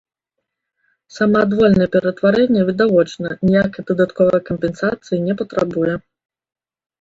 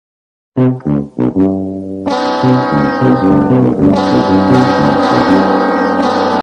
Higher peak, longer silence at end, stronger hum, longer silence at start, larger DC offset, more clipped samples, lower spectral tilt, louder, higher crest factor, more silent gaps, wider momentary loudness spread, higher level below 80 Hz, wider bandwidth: about the same, -2 dBFS vs 0 dBFS; first, 1 s vs 0 s; neither; first, 1.15 s vs 0.55 s; neither; neither; about the same, -7.5 dB/octave vs -7.5 dB/octave; second, -17 LUFS vs -11 LUFS; first, 16 dB vs 10 dB; neither; about the same, 8 LU vs 7 LU; second, -48 dBFS vs -40 dBFS; second, 7.8 kHz vs 9.4 kHz